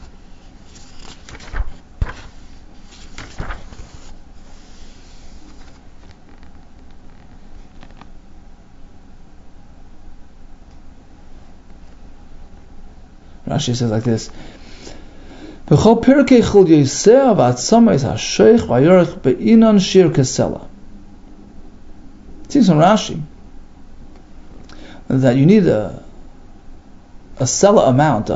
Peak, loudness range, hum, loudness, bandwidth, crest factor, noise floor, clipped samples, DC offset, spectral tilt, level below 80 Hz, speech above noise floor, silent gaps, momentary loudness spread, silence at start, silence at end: 0 dBFS; 22 LU; none; -13 LUFS; 8 kHz; 18 dB; -39 dBFS; under 0.1%; under 0.1%; -6 dB/octave; -36 dBFS; 27 dB; none; 24 LU; 0 s; 0 s